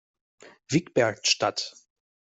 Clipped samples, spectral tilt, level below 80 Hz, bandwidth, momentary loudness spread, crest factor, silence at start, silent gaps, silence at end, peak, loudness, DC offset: under 0.1%; -3.5 dB/octave; -66 dBFS; 8.2 kHz; 9 LU; 20 dB; 0.7 s; none; 0.6 s; -8 dBFS; -25 LUFS; under 0.1%